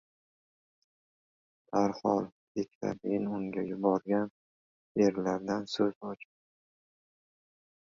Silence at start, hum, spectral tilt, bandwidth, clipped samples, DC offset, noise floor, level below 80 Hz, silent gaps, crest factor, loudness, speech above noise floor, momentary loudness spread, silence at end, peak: 1.7 s; none; -6.5 dB/octave; 7.6 kHz; under 0.1%; under 0.1%; under -90 dBFS; -72 dBFS; 2.32-2.55 s, 2.75-2.81 s, 4.30-4.95 s, 5.95-6.01 s; 22 dB; -32 LUFS; over 59 dB; 10 LU; 1.8 s; -12 dBFS